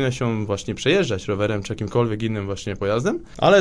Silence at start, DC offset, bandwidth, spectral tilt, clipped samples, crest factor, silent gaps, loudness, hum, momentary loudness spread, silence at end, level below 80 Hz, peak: 0 s; 0.6%; 10.5 kHz; -5.5 dB/octave; under 0.1%; 18 dB; none; -23 LUFS; none; 7 LU; 0 s; -46 dBFS; -2 dBFS